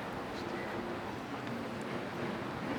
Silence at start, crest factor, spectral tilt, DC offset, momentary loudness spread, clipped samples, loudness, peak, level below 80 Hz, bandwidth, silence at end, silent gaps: 0 s; 14 dB; -6 dB/octave; under 0.1%; 2 LU; under 0.1%; -39 LUFS; -26 dBFS; -64 dBFS; over 20 kHz; 0 s; none